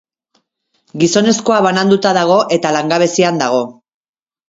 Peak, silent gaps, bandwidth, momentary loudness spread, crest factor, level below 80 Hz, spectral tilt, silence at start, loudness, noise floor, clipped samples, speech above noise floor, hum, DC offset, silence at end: 0 dBFS; none; 7.8 kHz; 5 LU; 14 dB; -58 dBFS; -4.5 dB/octave; 0.95 s; -13 LUFS; -65 dBFS; under 0.1%; 53 dB; none; under 0.1%; 0.75 s